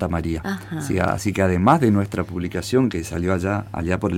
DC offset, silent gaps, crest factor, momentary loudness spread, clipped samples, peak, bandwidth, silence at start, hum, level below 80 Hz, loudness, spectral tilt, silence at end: under 0.1%; none; 18 dB; 10 LU; under 0.1%; -4 dBFS; 16.5 kHz; 0 s; none; -40 dBFS; -21 LUFS; -6.5 dB/octave; 0 s